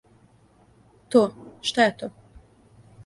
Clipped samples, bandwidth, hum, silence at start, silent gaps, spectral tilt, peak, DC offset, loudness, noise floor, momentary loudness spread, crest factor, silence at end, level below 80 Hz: under 0.1%; 11.5 kHz; none; 1.1 s; none; -4 dB/octave; -6 dBFS; under 0.1%; -23 LUFS; -58 dBFS; 15 LU; 22 dB; 0.95 s; -60 dBFS